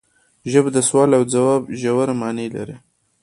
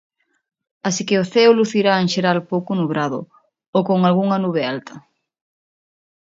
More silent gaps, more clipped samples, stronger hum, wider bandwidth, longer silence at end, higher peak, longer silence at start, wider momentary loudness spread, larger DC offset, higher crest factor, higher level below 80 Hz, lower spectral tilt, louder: second, none vs 3.68-3.73 s; neither; neither; first, 11.5 kHz vs 7.8 kHz; second, 0.45 s vs 1.4 s; about the same, 0 dBFS vs 0 dBFS; second, 0.45 s vs 0.85 s; first, 14 LU vs 11 LU; neither; about the same, 18 dB vs 18 dB; first, -58 dBFS vs -66 dBFS; about the same, -5.5 dB/octave vs -5.5 dB/octave; about the same, -18 LUFS vs -18 LUFS